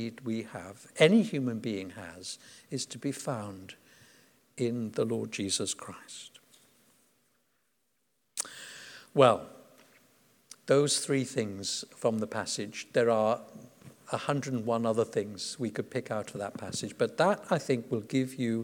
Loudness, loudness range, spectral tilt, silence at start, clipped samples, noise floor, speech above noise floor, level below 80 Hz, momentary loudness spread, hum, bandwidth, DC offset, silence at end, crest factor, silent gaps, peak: -31 LUFS; 8 LU; -4.5 dB/octave; 0 s; under 0.1%; -78 dBFS; 47 dB; -76 dBFS; 19 LU; none; 19 kHz; under 0.1%; 0 s; 24 dB; none; -8 dBFS